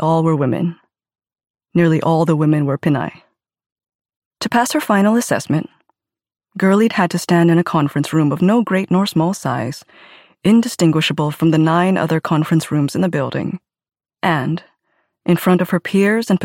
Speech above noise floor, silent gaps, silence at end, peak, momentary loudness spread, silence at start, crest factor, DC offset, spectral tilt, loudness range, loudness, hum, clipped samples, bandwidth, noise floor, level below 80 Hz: 52 dB; 1.50-1.54 s, 3.72-3.76 s, 3.95-3.99 s, 4.16-4.31 s; 0 s; -4 dBFS; 9 LU; 0 s; 14 dB; under 0.1%; -6.5 dB/octave; 4 LU; -16 LUFS; none; under 0.1%; 16.5 kHz; -68 dBFS; -60 dBFS